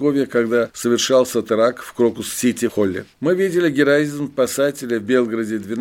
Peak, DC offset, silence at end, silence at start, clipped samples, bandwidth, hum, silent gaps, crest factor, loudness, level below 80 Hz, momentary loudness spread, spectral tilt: -2 dBFS; under 0.1%; 0 s; 0 s; under 0.1%; 17 kHz; none; none; 16 dB; -19 LUFS; -60 dBFS; 6 LU; -4.5 dB/octave